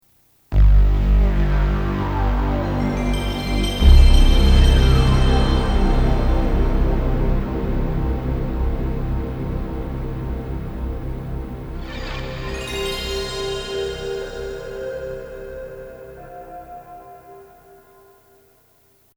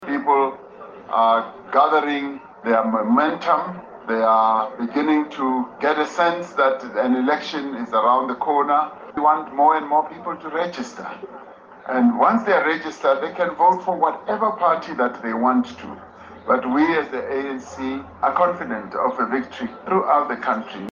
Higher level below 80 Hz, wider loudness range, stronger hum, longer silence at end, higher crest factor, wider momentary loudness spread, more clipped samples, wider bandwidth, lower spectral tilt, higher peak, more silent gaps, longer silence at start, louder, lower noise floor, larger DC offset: first, -20 dBFS vs -66 dBFS; first, 17 LU vs 3 LU; neither; first, 1.75 s vs 0 s; about the same, 18 dB vs 18 dB; first, 18 LU vs 13 LU; neither; first, 13 kHz vs 7.4 kHz; about the same, -6.5 dB/octave vs -5.5 dB/octave; about the same, 0 dBFS vs -2 dBFS; neither; first, 0.5 s vs 0 s; about the same, -21 LUFS vs -20 LUFS; first, -58 dBFS vs -40 dBFS; neither